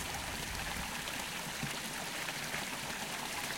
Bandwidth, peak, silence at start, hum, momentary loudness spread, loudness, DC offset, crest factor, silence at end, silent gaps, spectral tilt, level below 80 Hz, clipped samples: 17 kHz; -20 dBFS; 0 s; none; 1 LU; -38 LUFS; under 0.1%; 20 dB; 0 s; none; -2 dB/octave; -56 dBFS; under 0.1%